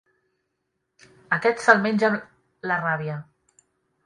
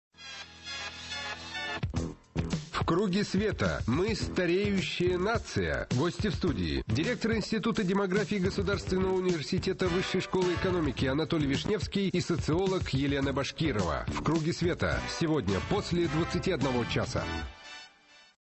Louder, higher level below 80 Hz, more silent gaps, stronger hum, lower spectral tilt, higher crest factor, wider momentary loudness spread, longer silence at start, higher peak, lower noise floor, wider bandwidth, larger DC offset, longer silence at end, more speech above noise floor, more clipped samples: first, -22 LUFS vs -30 LUFS; second, -68 dBFS vs -44 dBFS; neither; neither; about the same, -5.5 dB/octave vs -6 dB/octave; first, 24 dB vs 14 dB; first, 15 LU vs 8 LU; first, 1.3 s vs 0.2 s; first, -2 dBFS vs -16 dBFS; first, -77 dBFS vs -58 dBFS; first, 11 kHz vs 8.6 kHz; neither; first, 0.85 s vs 0.55 s; first, 56 dB vs 29 dB; neither